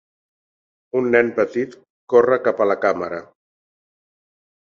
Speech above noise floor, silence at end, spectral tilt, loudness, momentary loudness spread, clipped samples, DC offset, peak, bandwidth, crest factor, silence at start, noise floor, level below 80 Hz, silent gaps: over 72 dB; 1.45 s; -7 dB/octave; -19 LUFS; 12 LU; under 0.1%; under 0.1%; -2 dBFS; 7.2 kHz; 20 dB; 0.95 s; under -90 dBFS; -64 dBFS; 1.90-2.07 s